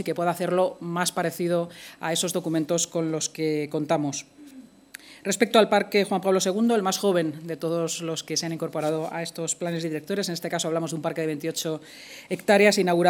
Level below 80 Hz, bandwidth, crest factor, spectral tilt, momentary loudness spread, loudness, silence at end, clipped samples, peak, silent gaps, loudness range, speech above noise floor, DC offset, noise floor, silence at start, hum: -74 dBFS; 19 kHz; 22 dB; -4 dB/octave; 12 LU; -25 LUFS; 0 s; under 0.1%; -4 dBFS; none; 5 LU; 23 dB; under 0.1%; -48 dBFS; 0 s; none